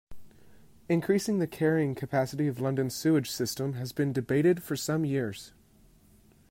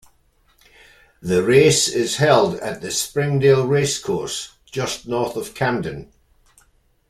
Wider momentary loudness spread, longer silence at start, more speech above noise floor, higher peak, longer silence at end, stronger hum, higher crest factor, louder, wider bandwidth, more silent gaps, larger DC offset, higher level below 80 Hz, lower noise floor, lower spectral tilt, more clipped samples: second, 6 LU vs 13 LU; second, 0.1 s vs 1.25 s; second, 31 dB vs 41 dB; second, -14 dBFS vs -2 dBFS; about the same, 1 s vs 1.05 s; neither; about the same, 16 dB vs 18 dB; second, -29 LUFS vs -19 LUFS; about the same, 16 kHz vs 15.5 kHz; neither; neither; second, -62 dBFS vs -52 dBFS; about the same, -60 dBFS vs -59 dBFS; first, -6 dB/octave vs -4 dB/octave; neither